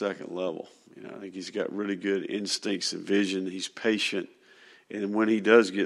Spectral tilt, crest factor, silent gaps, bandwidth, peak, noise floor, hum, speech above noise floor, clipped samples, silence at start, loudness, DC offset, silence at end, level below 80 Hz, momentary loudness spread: -4 dB/octave; 24 dB; none; 12.5 kHz; -6 dBFS; -56 dBFS; none; 28 dB; under 0.1%; 0 s; -28 LUFS; under 0.1%; 0 s; -80 dBFS; 18 LU